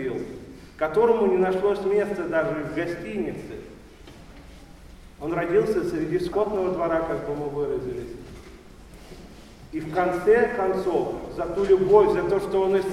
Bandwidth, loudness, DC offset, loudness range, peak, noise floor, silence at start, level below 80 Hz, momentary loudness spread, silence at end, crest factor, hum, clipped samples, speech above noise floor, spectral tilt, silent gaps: 13 kHz; -24 LUFS; under 0.1%; 8 LU; -4 dBFS; -45 dBFS; 0 s; -48 dBFS; 19 LU; 0 s; 22 dB; none; under 0.1%; 22 dB; -7 dB/octave; none